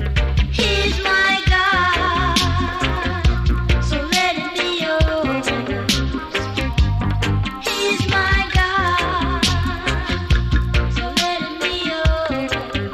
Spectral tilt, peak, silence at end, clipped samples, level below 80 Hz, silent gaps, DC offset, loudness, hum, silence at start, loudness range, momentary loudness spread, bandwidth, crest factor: -4.5 dB/octave; -2 dBFS; 0 s; under 0.1%; -24 dBFS; none; under 0.1%; -18 LUFS; none; 0 s; 3 LU; 6 LU; 13.5 kHz; 16 dB